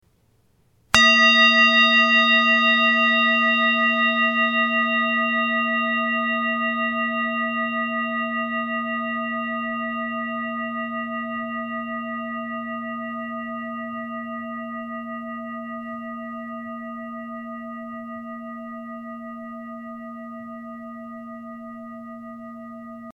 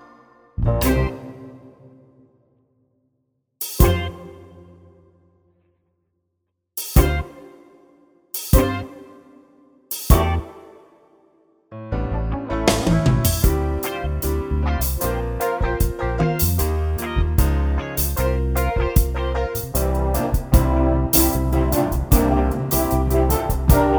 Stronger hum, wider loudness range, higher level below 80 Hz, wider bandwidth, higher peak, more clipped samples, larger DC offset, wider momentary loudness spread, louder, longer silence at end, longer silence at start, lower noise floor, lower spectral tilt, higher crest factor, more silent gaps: neither; first, 21 LU vs 8 LU; second, -62 dBFS vs -24 dBFS; second, 11.5 kHz vs over 20 kHz; about the same, 0 dBFS vs 0 dBFS; neither; neither; first, 22 LU vs 12 LU; about the same, -20 LUFS vs -20 LUFS; about the same, 0 s vs 0 s; first, 0.95 s vs 0.6 s; second, -62 dBFS vs -75 dBFS; second, -2.5 dB/octave vs -5.5 dB/octave; about the same, 24 dB vs 20 dB; neither